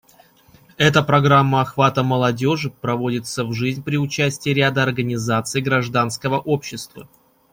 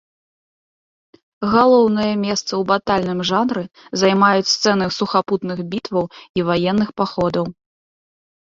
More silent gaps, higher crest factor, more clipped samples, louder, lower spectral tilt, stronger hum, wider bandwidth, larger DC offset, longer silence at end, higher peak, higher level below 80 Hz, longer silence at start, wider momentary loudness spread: second, none vs 6.29-6.34 s; about the same, 18 dB vs 18 dB; neither; about the same, -19 LUFS vs -18 LUFS; about the same, -5.5 dB/octave vs -5 dB/octave; neither; first, 16 kHz vs 7.8 kHz; neither; second, 0.5 s vs 0.95 s; about the same, -2 dBFS vs -2 dBFS; about the same, -54 dBFS vs -54 dBFS; second, 0.8 s vs 1.4 s; about the same, 9 LU vs 11 LU